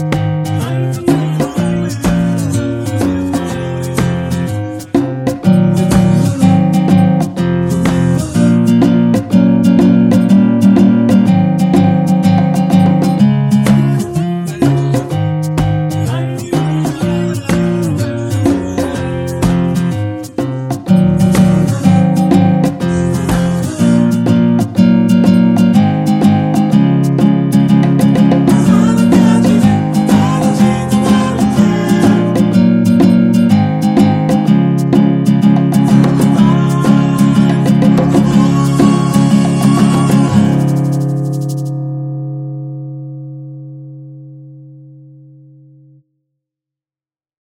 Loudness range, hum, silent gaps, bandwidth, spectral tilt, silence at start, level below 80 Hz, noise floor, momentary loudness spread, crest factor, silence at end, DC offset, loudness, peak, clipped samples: 6 LU; none; none; 15.5 kHz; -7.5 dB/octave; 0 s; -36 dBFS; under -90 dBFS; 8 LU; 10 dB; 2.7 s; under 0.1%; -11 LUFS; 0 dBFS; under 0.1%